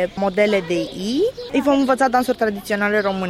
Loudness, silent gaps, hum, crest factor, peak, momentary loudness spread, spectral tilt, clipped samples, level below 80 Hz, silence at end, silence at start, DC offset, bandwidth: -19 LUFS; none; none; 16 dB; -4 dBFS; 5 LU; -5 dB/octave; under 0.1%; -50 dBFS; 0 s; 0 s; under 0.1%; 16 kHz